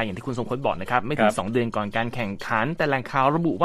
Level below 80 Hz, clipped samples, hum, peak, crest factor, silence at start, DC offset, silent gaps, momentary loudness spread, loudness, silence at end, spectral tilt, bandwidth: -50 dBFS; under 0.1%; none; -4 dBFS; 20 dB; 0 s; under 0.1%; none; 7 LU; -24 LUFS; 0 s; -6 dB/octave; 14 kHz